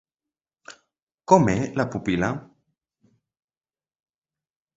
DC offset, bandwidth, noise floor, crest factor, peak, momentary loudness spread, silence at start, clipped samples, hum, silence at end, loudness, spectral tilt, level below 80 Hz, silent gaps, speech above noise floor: under 0.1%; 8 kHz; under -90 dBFS; 26 dB; 0 dBFS; 14 LU; 0.7 s; under 0.1%; none; 2.35 s; -22 LUFS; -6.5 dB/octave; -52 dBFS; 1.02-1.07 s; over 69 dB